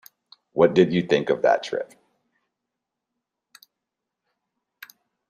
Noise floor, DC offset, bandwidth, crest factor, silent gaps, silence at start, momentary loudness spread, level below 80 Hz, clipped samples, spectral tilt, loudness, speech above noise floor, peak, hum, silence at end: -84 dBFS; under 0.1%; 14.5 kHz; 22 dB; none; 0.55 s; 14 LU; -66 dBFS; under 0.1%; -6.5 dB/octave; -21 LUFS; 64 dB; -4 dBFS; none; 3.45 s